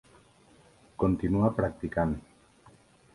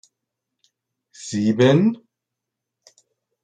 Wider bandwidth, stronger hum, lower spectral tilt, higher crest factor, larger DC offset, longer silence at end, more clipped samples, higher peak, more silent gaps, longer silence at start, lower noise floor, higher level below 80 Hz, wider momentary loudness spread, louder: first, 11.5 kHz vs 9.4 kHz; neither; first, -9.5 dB/octave vs -6.5 dB/octave; about the same, 20 dB vs 20 dB; neither; second, 0.95 s vs 1.5 s; neither; second, -10 dBFS vs -4 dBFS; neither; second, 1 s vs 1.2 s; second, -59 dBFS vs -83 dBFS; first, -48 dBFS vs -66 dBFS; second, 9 LU vs 22 LU; second, -29 LUFS vs -18 LUFS